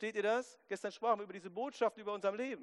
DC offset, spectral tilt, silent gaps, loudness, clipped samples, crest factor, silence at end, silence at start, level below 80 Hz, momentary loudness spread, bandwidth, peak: under 0.1%; -4 dB/octave; none; -38 LUFS; under 0.1%; 18 dB; 0 s; 0 s; -88 dBFS; 8 LU; 11.5 kHz; -20 dBFS